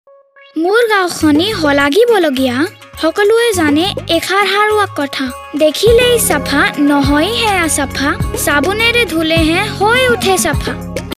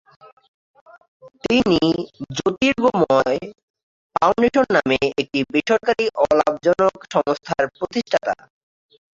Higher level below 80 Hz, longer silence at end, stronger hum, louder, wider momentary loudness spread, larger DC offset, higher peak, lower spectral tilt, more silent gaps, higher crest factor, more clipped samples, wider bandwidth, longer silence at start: first, -32 dBFS vs -52 dBFS; second, 0.05 s vs 0.85 s; neither; first, -12 LUFS vs -19 LUFS; about the same, 8 LU vs 9 LU; neither; about the same, 0 dBFS vs -2 dBFS; second, -3.5 dB/octave vs -5 dB/octave; second, none vs 3.63-3.74 s, 3.83-4.10 s; second, 12 dB vs 18 dB; neither; first, 16 kHz vs 7.8 kHz; second, 0.55 s vs 1.25 s